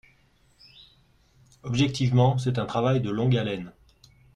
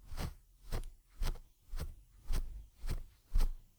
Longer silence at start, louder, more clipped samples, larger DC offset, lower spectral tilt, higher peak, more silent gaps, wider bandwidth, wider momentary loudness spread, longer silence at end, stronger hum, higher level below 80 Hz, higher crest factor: first, 1.65 s vs 0.05 s; first, -25 LUFS vs -46 LUFS; neither; neither; first, -7 dB/octave vs -5 dB/octave; first, -8 dBFS vs -20 dBFS; neither; second, 9.8 kHz vs 19 kHz; about the same, 13 LU vs 14 LU; first, 0.65 s vs 0.15 s; neither; second, -54 dBFS vs -38 dBFS; about the same, 18 dB vs 16 dB